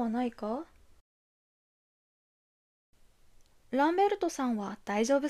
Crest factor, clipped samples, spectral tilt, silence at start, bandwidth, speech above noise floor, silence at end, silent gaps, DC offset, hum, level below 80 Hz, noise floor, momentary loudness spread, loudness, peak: 18 dB; under 0.1%; -4.5 dB/octave; 0 s; 14 kHz; 30 dB; 0 s; 1.01-2.93 s; under 0.1%; none; -66 dBFS; -60 dBFS; 11 LU; -31 LUFS; -16 dBFS